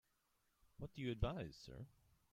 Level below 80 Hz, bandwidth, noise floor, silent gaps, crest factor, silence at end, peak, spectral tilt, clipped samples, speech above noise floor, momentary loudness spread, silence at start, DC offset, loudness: -56 dBFS; 15.5 kHz; -83 dBFS; none; 22 dB; 0.45 s; -26 dBFS; -7 dB/octave; under 0.1%; 36 dB; 14 LU; 0.8 s; under 0.1%; -48 LUFS